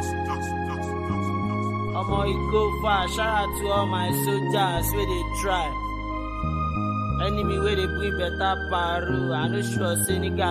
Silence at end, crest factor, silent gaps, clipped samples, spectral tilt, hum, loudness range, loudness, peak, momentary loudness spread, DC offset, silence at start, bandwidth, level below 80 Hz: 0 s; 16 dB; none; under 0.1%; -5 dB/octave; none; 2 LU; -25 LUFS; -10 dBFS; 5 LU; under 0.1%; 0 s; 15.5 kHz; -34 dBFS